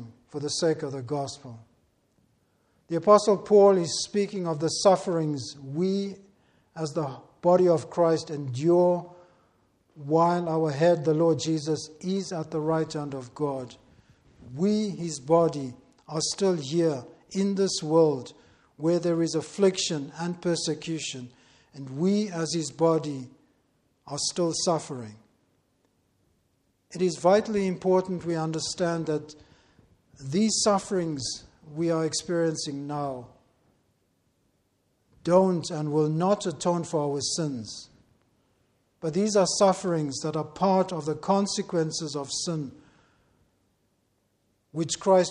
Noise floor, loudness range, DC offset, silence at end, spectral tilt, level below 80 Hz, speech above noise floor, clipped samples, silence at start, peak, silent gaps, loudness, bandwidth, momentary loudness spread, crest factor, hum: -72 dBFS; 7 LU; under 0.1%; 0 s; -5 dB/octave; -66 dBFS; 46 dB; under 0.1%; 0 s; -6 dBFS; none; -26 LUFS; 11.5 kHz; 14 LU; 22 dB; none